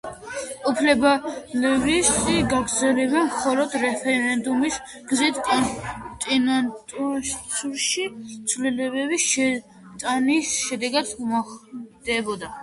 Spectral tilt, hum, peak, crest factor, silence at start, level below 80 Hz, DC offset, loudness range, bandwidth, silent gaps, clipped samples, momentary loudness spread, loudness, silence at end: -2.5 dB/octave; none; -6 dBFS; 18 dB; 0.05 s; -50 dBFS; under 0.1%; 4 LU; 11.5 kHz; none; under 0.1%; 12 LU; -22 LUFS; 0 s